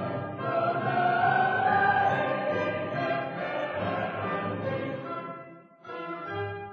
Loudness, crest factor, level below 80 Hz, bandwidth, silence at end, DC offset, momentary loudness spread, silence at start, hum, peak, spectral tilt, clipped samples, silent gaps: -28 LUFS; 16 dB; -66 dBFS; 6.6 kHz; 0 s; under 0.1%; 14 LU; 0 s; none; -12 dBFS; -7.5 dB/octave; under 0.1%; none